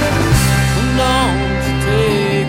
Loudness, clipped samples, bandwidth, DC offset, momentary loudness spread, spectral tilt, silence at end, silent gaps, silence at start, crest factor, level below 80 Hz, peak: -14 LUFS; under 0.1%; 16.5 kHz; under 0.1%; 4 LU; -5 dB/octave; 0 s; none; 0 s; 14 dB; -24 dBFS; 0 dBFS